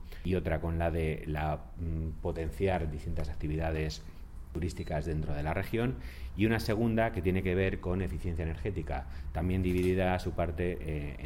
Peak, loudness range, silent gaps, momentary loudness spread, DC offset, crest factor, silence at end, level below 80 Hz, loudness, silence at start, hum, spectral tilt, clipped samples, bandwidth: -16 dBFS; 4 LU; none; 9 LU; under 0.1%; 16 dB; 0 s; -40 dBFS; -33 LUFS; 0 s; none; -7.5 dB/octave; under 0.1%; 16.5 kHz